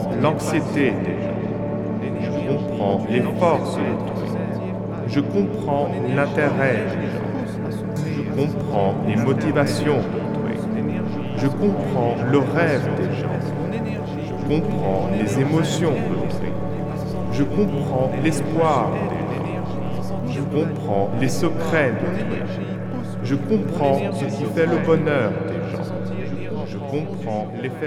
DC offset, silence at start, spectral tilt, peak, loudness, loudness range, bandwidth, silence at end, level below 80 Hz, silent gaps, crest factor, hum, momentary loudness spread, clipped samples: under 0.1%; 0 s; -7 dB/octave; -4 dBFS; -22 LUFS; 1 LU; 14.5 kHz; 0 s; -46 dBFS; none; 18 dB; none; 8 LU; under 0.1%